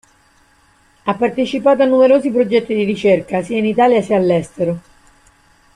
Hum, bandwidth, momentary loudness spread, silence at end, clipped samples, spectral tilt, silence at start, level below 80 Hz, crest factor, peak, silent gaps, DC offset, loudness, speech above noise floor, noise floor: none; 10.5 kHz; 10 LU; 0.95 s; under 0.1%; -7 dB/octave; 1.05 s; -54 dBFS; 14 dB; -2 dBFS; none; under 0.1%; -15 LUFS; 39 dB; -53 dBFS